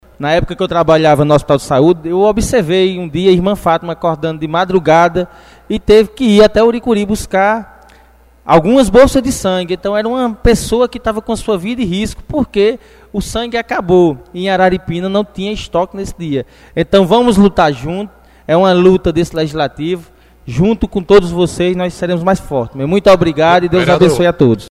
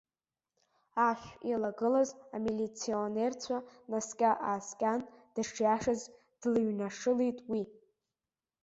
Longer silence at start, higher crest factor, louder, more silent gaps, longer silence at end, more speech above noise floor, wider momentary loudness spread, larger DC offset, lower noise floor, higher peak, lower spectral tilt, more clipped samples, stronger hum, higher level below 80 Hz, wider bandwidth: second, 0.2 s vs 0.95 s; second, 12 dB vs 18 dB; first, -12 LUFS vs -34 LUFS; neither; second, 0.05 s vs 0.9 s; second, 33 dB vs over 57 dB; about the same, 11 LU vs 9 LU; neither; second, -45 dBFS vs under -90 dBFS; first, 0 dBFS vs -16 dBFS; about the same, -6 dB/octave vs -5 dB/octave; first, 0.3% vs under 0.1%; neither; first, -32 dBFS vs -70 dBFS; first, 15 kHz vs 8 kHz